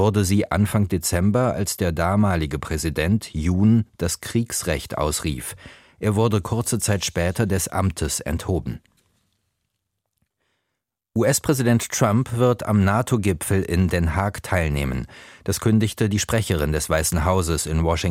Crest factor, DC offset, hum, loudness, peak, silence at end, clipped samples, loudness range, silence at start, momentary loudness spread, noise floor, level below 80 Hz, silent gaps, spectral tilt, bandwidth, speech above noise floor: 18 dB; under 0.1%; none; -22 LUFS; -4 dBFS; 0 s; under 0.1%; 6 LU; 0 s; 7 LU; -81 dBFS; -36 dBFS; none; -5.5 dB/octave; 16.5 kHz; 60 dB